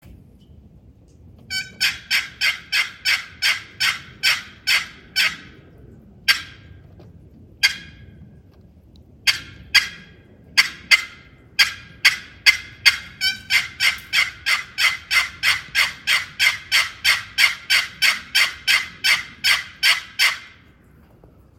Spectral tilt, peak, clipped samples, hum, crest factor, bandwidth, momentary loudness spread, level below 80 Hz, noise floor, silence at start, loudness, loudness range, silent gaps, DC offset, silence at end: 1 dB/octave; 0 dBFS; under 0.1%; none; 22 dB; 16.5 kHz; 6 LU; -52 dBFS; -51 dBFS; 0.05 s; -18 LUFS; 6 LU; none; under 0.1%; 1.1 s